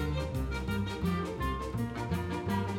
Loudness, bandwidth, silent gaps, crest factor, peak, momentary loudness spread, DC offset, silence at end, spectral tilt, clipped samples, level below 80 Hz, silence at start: -34 LUFS; 16 kHz; none; 14 dB; -18 dBFS; 2 LU; under 0.1%; 0 s; -7 dB/octave; under 0.1%; -42 dBFS; 0 s